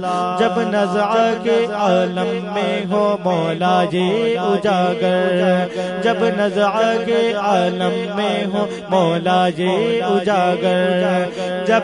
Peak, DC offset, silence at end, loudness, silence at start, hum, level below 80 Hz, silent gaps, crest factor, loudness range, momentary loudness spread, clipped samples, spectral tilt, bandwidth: -2 dBFS; under 0.1%; 0 s; -17 LUFS; 0 s; none; -62 dBFS; none; 14 dB; 1 LU; 4 LU; under 0.1%; -6 dB/octave; 10.5 kHz